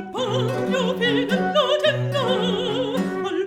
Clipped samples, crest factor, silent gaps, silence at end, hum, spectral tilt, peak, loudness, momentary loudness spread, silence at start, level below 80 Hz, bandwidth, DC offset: under 0.1%; 16 dB; none; 0 s; none; -5.5 dB/octave; -6 dBFS; -21 LUFS; 5 LU; 0 s; -64 dBFS; 15.5 kHz; under 0.1%